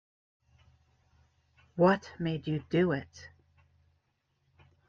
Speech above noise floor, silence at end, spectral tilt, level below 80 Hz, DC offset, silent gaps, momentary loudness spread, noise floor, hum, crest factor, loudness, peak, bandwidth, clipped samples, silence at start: 48 dB; 1.6 s; -7.5 dB/octave; -66 dBFS; under 0.1%; none; 20 LU; -77 dBFS; none; 22 dB; -30 LUFS; -12 dBFS; 7.2 kHz; under 0.1%; 1.75 s